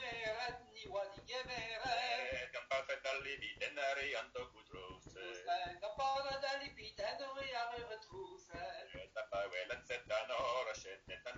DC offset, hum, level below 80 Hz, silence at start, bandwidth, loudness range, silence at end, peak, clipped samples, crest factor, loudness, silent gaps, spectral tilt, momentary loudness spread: under 0.1%; none; -68 dBFS; 0 s; 7.8 kHz; 4 LU; 0 s; -26 dBFS; under 0.1%; 18 dB; -43 LUFS; none; -2.5 dB/octave; 12 LU